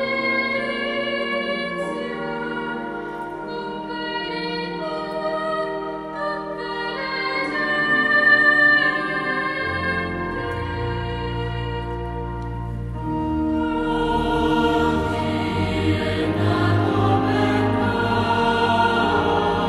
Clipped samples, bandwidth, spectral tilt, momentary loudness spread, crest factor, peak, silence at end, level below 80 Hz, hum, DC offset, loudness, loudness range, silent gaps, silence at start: under 0.1%; 12.5 kHz; -6.5 dB/octave; 11 LU; 16 dB; -6 dBFS; 0 s; -38 dBFS; none; under 0.1%; -21 LUFS; 9 LU; none; 0 s